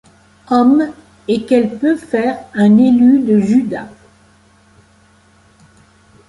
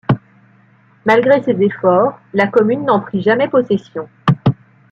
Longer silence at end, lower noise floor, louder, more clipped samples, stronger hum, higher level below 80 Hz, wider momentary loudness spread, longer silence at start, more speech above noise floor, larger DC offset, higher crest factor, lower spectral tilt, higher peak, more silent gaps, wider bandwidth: first, 2.4 s vs 0.4 s; about the same, -50 dBFS vs -50 dBFS; about the same, -13 LUFS vs -15 LUFS; neither; neither; about the same, -54 dBFS vs -52 dBFS; first, 12 LU vs 7 LU; first, 0.5 s vs 0.1 s; about the same, 38 dB vs 36 dB; neither; about the same, 14 dB vs 14 dB; about the same, -7.5 dB/octave vs -8.5 dB/octave; about the same, -2 dBFS vs -2 dBFS; neither; first, 11 kHz vs 7.4 kHz